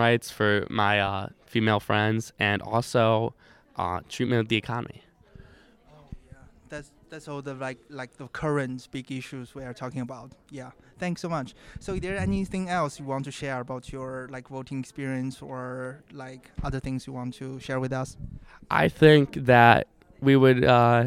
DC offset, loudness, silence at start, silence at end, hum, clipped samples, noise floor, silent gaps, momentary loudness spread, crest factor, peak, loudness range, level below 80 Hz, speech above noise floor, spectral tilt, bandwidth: under 0.1%; -25 LUFS; 0 s; 0 s; none; under 0.1%; -55 dBFS; none; 22 LU; 24 dB; -2 dBFS; 13 LU; -50 dBFS; 29 dB; -6.5 dB/octave; 15 kHz